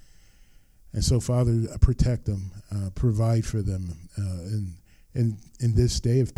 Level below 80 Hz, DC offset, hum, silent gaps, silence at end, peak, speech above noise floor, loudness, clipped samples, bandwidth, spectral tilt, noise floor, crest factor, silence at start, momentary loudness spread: -34 dBFS; under 0.1%; none; none; 0.05 s; -6 dBFS; 30 dB; -26 LUFS; under 0.1%; 12.5 kHz; -6.5 dB/octave; -54 dBFS; 20 dB; 0.95 s; 11 LU